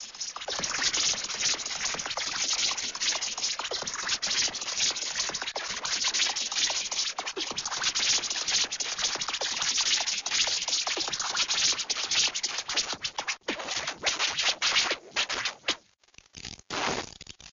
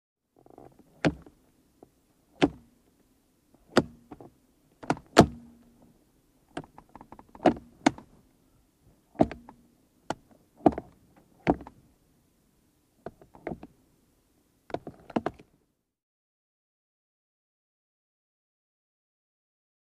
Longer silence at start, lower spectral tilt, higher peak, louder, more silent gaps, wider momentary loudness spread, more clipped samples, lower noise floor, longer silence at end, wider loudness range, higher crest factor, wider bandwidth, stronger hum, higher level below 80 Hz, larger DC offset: second, 0 s vs 1.05 s; second, 1 dB/octave vs -5.5 dB/octave; second, -14 dBFS vs 0 dBFS; about the same, -27 LUFS vs -29 LUFS; neither; second, 8 LU vs 24 LU; neither; second, -58 dBFS vs -72 dBFS; second, 0 s vs 4.6 s; second, 2 LU vs 12 LU; second, 16 dB vs 32 dB; second, 8 kHz vs 15 kHz; neither; second, -62 dBFS vs -54 dBFS; neither